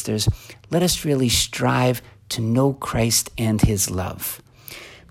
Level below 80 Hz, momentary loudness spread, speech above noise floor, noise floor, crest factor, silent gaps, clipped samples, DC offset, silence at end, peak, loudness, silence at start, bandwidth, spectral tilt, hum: -38 dBFS; 16 LU; 20 dB; -41 dBFS; 18 dB; none; under 0.1%; under 0.1%; 0.15 s; -4 dBFS; -21 LUFS; 0 s; 16.5 kHz; -4.5 dB/octave; none